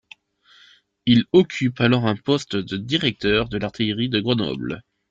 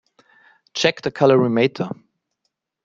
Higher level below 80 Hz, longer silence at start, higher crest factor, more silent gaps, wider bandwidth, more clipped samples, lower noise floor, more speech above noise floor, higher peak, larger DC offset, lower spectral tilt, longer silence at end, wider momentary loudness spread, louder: first, -50 dBFS vs -64 dBFS; first, 1.05 s vs 0.75 s; about the same, 18 dB vs 20 dB; neither; about the same, 7.8 kHz vs 7.6 kHz; neither; second, -55 dBFS vs -76 dBFS; second, 35 dB vs 58 dB; about the same, -4 dBFS vs -2 dBFS; neither; about the same, -6.5 dB/octave vs -5.5 dB/octave; second, 0.3 s vs 0.9 s; second, 9 LU vs 15 LU; about the same, -21 LUFS vs -19 LUFS